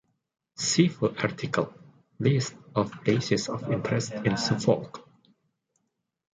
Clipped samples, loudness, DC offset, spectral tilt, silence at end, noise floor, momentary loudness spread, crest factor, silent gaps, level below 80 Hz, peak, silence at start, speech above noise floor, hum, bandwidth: under 0.1%; -27 LUFS; under 0.1%; -5 dB/octave; 1.35 s; -80 dBFS; 7 LU; 22 dB; none; -62 dBFS; -6 dBFS; 0.6 s; 53 dB; none; 9.6 kHz